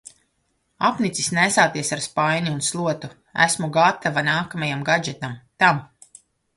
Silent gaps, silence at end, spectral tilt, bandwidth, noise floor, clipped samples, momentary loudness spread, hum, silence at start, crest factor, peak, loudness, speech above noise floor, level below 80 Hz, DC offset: none; 0.7 s; -3.5 dB/octave; 11.5 kHz; -70 dBFS; under 0.1%; 10 LU; none; 0.8 s; 20 dB; -2 dBFS; -21 LUFS; 49 dB; -62 dBFS; under 0.1%